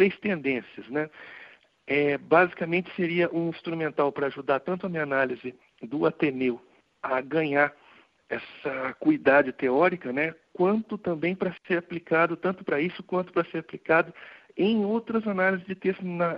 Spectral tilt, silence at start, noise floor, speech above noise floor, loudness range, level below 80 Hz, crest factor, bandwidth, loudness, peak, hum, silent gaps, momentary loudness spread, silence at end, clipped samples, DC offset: -9 dB/octave; 0 s; -57 dBFS; 31 dB; 3 LU; -70 dBFS; 20 dB; 5.6 kHz; -27 LUFS; -6 dBFS; none; none; 12 LU; 0 s; under 0.1%; under 0.1%